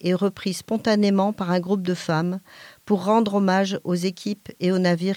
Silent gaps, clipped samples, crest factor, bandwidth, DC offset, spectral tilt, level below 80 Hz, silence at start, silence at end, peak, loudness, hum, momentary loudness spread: none; under 0.1%; 14 dB; 15.5 kHz; under 0.1%; -6.5 dB/octave; -66 dBFS; 0.05 s; 0 s; -8 dBFS; -23 LUFS; none; 8 LU